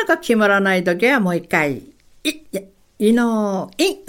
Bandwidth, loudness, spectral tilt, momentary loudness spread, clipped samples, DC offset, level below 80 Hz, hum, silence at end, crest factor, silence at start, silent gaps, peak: 17 kHz; -18 LUFS; -5 dB/octave; 13 LU; under 0.1%; under 0.1%; -56 dBFS; none; 0.1 s; 16 dB; 0 s; none; -2 dBFS